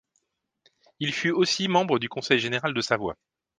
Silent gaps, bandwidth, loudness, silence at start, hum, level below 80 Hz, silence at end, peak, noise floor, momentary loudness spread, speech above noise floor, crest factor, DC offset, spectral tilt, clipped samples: none; 9.8 kHz; -25 LUFS; 1 s; none; -64 dBFS; 0.45 s; -6 dBFS; -75 dBFS; 8 LU; 50 dB; 20 dB; under 0.1%; -4 dB/octave; under 0.1%